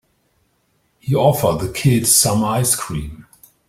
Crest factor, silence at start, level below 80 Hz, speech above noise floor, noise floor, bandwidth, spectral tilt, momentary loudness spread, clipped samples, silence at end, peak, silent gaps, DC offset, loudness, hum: 18 dB; 1.05 s; -42 dBFS; 47 dB; -64 dBFS; 16.5 kHz; -4 dB/octave; 15 LU; under 0.1%; 0.45 s; 0 dBFS; none; under 0.1%; -16 LUFS; none